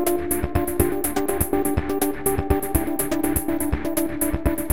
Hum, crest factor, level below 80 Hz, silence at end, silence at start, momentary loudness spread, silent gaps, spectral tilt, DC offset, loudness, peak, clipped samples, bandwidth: none; 18 dB; -32 dBFS; 0 s; 0 s; 2 LU; none; -5.5 dB/octave; 2%; -23 LUFS; -4 dBFS; under 0.1%; 17 kHz